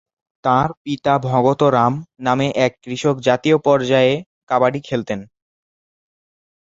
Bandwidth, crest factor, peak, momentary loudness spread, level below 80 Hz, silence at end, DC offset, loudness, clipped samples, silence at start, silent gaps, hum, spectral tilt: 8 kHz; 16 dB; -2 dBFS; 9 LU; -54 dBFS; 1.4 s; under 0.1%; -18 LUFS; under 0.1%; 0.45 s; 0.77-0.85 s, 4.26-4.47 s; none; -6.5 dB/octave